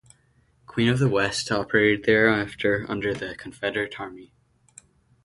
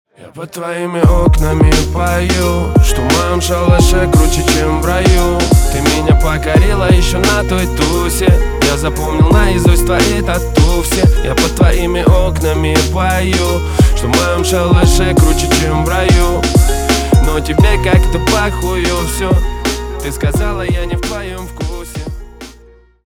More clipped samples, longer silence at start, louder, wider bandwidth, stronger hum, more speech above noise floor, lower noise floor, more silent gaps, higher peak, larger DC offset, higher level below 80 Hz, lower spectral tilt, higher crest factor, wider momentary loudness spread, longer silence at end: neither; first, 0.7 s vs 0.2 s; second, -23 LUFS vs -12 LUFS; second, 11.5 kHz vs 19 kHz; neither; first, 39 dB vs 32 dB; first, -63 dBFS vs -42 dBFS; neither; second, -4 dBFS vs 0 dBFS; neither; second, -54 dBFS vs -16 dBFS; about the same, -5.5 dB/octave vs -5 dB/octave; first, 20 dB vs 10 dB; first, 13 LU vs 8 LU; first, 1 s vs 0.55 s